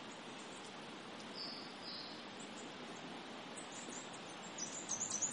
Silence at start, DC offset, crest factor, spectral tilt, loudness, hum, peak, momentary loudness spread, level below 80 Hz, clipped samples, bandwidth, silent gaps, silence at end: 0 s; under 0.1%; 20 dB; -1.5 dB/octave; -46 LUFS; none; -28 dBFS; 9 LU; -84 dBFS; under 0.1%; 11.5 kHz; none; 0 s